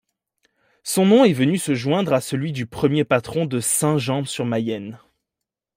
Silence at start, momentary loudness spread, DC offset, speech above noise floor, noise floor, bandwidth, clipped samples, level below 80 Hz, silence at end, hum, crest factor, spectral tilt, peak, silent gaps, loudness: 0.85 s; 12 LU; under 0.1%; 65 dB; -85 dBFS; 16 kHz; under 0.1%; -58 dBFS; 0.8 s; none; 18 dB; -5 dB/octave; -4 dBFS; none; -20 LUFS